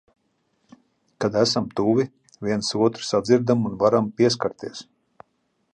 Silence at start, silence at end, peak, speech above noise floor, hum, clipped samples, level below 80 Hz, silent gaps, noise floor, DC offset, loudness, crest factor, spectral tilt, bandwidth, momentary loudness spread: 1.2 s; 0.9 s; -4 dBFS; 49 dB; none; under 0.1%; -60 dBFS; none; -70 dBFS; under 0.1%; -22 LUFS; 18 dB; -5.5 dB/octave; 10.5 kHz; 11 LU